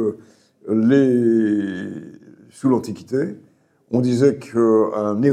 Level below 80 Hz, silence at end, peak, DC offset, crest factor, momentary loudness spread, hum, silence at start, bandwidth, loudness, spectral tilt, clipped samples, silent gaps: -68 dBFS; 0 s; -4 dBFS; under 0.1%; 16 dB; 13 LU; none; 0 s; 11 kHz; -19 LUFS; -8 dB/octave; under 0.1%; none